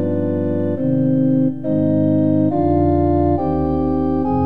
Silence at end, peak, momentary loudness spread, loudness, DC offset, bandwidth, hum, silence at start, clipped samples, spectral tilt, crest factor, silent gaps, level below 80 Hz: 0 s; -4 dBFS; 4 LU; -17 LUFS; 2%; 4.1 kHz; none; 0 s; under 0.1%; -12.5 dB/octave; 12 dB; none; -36 dBFS